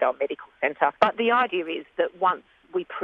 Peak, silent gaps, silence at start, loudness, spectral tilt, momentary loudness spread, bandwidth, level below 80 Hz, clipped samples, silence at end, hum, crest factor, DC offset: -4 dBFS; none; 0 s; -25 LUFS; -5.5 dB/octave; 10 LU; 7.4 kHz; -70 dBFS; under 0.1%; 0 s; none; 22 dB; under 0.1%